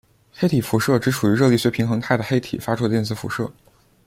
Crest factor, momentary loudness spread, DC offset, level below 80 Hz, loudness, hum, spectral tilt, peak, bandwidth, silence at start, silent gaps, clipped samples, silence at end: 18 dB; 9 LU; under 0.1%; -54 dBFS; -21 LUFS; none; -6 dB/octave; -4 dBFS; 16.5 kHz; 0.4 s; none; under 0.1%; 0.55 s